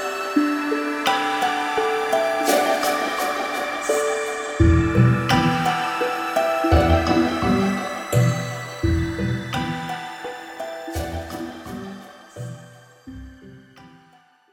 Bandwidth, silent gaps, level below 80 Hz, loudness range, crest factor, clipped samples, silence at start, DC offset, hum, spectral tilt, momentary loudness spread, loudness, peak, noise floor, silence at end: 16.5 kHz; none; -34 dBFS; 14 LU; 18 dB; under 0.1%; 0 s; under 0.1%; none; -5.5 dB/octave; 16 LU; -21 LUFS; -4 dBFS; -55 dBFS; 0.65 s